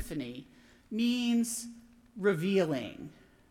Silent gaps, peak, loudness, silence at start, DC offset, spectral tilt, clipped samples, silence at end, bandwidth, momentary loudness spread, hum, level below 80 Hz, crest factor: none; -16 dBFS; -31 LUFS; 0 s; under 0.1%; -5 dB/octave; under 0.1%; 0.4 s; 16.5 kHz; 20 LU; none; -62 dBFS; 16 dB